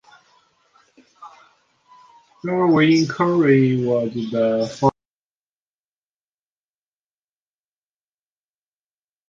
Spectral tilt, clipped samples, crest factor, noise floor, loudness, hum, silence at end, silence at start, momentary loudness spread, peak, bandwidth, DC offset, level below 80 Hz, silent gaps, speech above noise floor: -7 dB/octave; under 0.1%; 20 dB; under -90 dBFS; -18 LUFS; none; 4.4 s; 1.2 s; 7 LU; -2 dBFS; 7.6 kHz; under 0.1%; -62 dBFS; none; over 73 dB